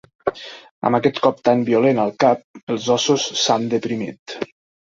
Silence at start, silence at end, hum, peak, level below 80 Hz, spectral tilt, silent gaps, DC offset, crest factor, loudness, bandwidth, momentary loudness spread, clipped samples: 0.25 s; 0.45 s; none; -2 dBFS; -60 dBFS; -4.5 dB/octave; 0.71-0.81 s, 2.44-2.54 s, 2.63-2.67 s, 4.19-4.26 s; under 0.1%; 18 dB; -19 LUFS; 7.8 kHz; 14 LU; under 0.1%